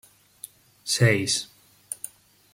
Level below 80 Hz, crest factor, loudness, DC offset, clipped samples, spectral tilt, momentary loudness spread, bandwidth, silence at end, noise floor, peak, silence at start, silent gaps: -62 dBFS; 22 dB; -24 LUFS; under 0.1%; under 0.1%; -3.5 dB/octave; 23 LU; 16.5 kHz; 0.45 s; -48 dBFS; -6 dBFS; 0.45 s; none